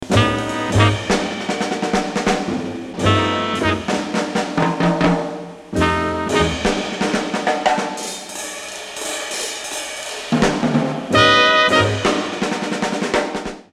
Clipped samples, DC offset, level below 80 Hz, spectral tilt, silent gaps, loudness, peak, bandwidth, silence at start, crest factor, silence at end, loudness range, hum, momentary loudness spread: under 0.1%; under 0.1%; -40 dBFS; -4.5 dB/octave; none; -19 LUFS; 0 dBFS; 15 kHz; 0 s; 18 dB; 0.1 s; 6 LU; none; 12 LU